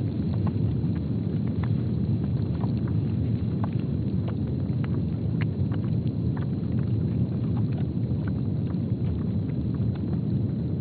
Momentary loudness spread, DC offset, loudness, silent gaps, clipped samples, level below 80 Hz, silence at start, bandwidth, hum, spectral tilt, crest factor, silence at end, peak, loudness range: 2 LU; under 0.1%; -27 LUFS; none; under 0.1%; -42 dBFS; 0 s; 4.6 kHz; none; -10 dB/octave; 12 dB; 0 s; -14 dBFS; 1 LU